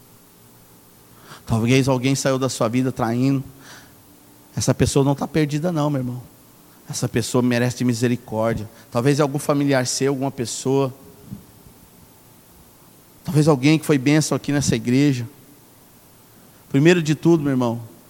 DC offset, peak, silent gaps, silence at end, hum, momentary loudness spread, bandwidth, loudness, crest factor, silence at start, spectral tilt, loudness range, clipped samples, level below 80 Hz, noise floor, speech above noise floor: under 0.1%; -2 dBFS; none; 0.2 s; none; 12 LU; 17.5 kHz; -20 LUFS; 18 dB; 1.3 s; -5.5 dB/octave; 4 LU; under 0.1%; -50 dBFS; -49 dBFS; 30 dB